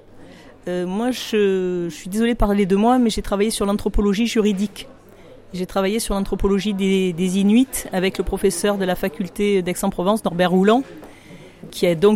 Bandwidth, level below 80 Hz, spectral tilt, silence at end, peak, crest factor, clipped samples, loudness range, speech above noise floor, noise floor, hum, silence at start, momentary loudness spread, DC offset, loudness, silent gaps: 16.5 kHz; -34 dBFS; -5.5 dB/octave; 0 s; -4 dBFS; 14 dB; under 0.1%; 2 LU; 25 dB; -44 dBFS; none; 0.15 s; 10 LU; under 0.1%; -20 LUFS; none